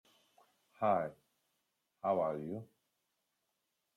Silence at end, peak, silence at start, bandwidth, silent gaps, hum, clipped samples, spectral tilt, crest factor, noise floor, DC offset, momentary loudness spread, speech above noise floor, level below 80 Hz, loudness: 1.3 s; -20 dBFS; 0.8 s; 13.5 kHz; none; none; under 0.1%; -8.5 dB/octave; 22 dB; -85 dBFS; under 0.1%; 11 LU; 50 dB; -82 dBFS; -37 LUFS